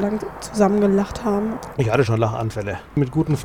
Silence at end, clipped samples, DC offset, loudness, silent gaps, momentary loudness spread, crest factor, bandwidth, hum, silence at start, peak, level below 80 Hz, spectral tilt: 0 s; under 0.1%; 0.2%; -21 LUFS; none; 9 LU; 16 dB; 16 kHz; none; 0 s; -4 dBFS; -42 dBFS; -7 dB/octave